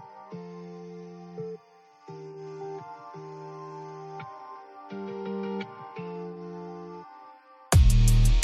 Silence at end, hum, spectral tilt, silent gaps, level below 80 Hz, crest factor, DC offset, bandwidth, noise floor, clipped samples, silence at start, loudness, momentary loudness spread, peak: 0 s; none; -5.5 dB/octave; none; -30 dBFS; 24 dB; under 0.1%; 14.5 kHz; -56 dBFS; under 0.1%; 0 s; -30 LUFS; 22 LU; -4 dBFS